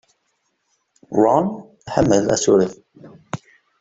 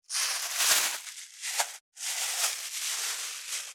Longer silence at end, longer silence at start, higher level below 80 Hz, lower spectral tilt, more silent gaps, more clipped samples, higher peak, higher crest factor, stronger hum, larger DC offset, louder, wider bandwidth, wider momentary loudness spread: first, 0.45 s vs 0 s; first, 1.1 s vs 0.1 s; first, -52 dBFS vs under -90 dBFS; first, -5.5 dB/octave vs 4 dB/octave; second, none vs 1.81-1.92 s; neither; first, -2 dBFS vs -10 dBFS; about the same, 20 dB vs 22 dB; neither; neither; first, -18 LUFS vs -29 LUFS; second, 8 kHz vs over 20 kHz; first, 17 LU vs 12 LU